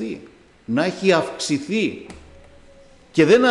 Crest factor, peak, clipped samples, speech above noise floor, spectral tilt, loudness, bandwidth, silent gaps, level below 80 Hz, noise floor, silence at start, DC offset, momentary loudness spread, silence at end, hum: 16 dB; -6 dBFS; under 0.1%; 30 dB; -5 dB/octave; -20 LUFS; 11 kHz; none; -54 dBFS; -48 dBFS; 0 s; under 0.1%; 21 LU; 0 s; none